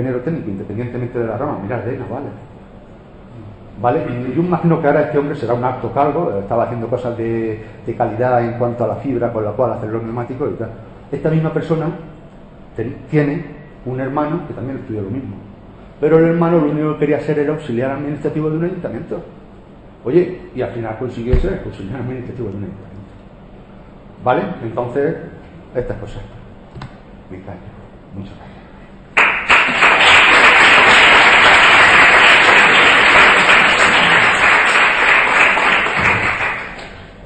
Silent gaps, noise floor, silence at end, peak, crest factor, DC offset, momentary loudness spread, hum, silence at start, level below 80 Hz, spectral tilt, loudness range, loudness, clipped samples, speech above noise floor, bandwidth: none; -39 dBFS; 0 s; 0 dBFS; 16 dB; 0.1%; 21 LU; none; 0 s; -36 dBFS; -4.5 dB/octave; 17 LU; -13 LUFS; under 0.1%; 21 dB; 8.8 kHz